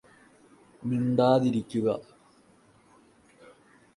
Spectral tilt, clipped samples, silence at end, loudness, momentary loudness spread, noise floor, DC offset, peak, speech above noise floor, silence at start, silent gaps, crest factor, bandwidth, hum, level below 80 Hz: -8 dB/octave; under 0.1%; 1.95 s; -27 LUFS; 12 LU; -60 dBFS; under 0.1%; -8 dBFS; 35 dB; 0.8 s; none; 22 dB; 11.5 kHz; none; -68 dBFS